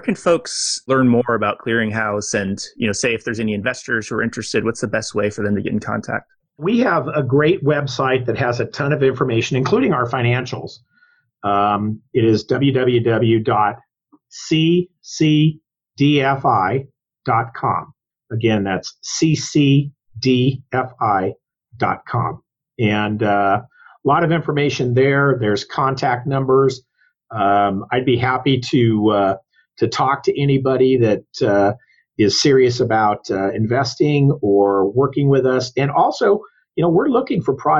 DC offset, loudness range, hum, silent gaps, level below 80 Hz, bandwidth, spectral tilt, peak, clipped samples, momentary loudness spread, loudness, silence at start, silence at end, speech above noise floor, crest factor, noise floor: under 0.1%; 4 LU; none; none; -54 dBFS; 10 kHz; -5.5 dB/octave; -4 dBFS; under 0.1%; 8 LU; -18 LUFS; 0.05 s; 0 s; 41 dB; 12 dB; -58 dBFS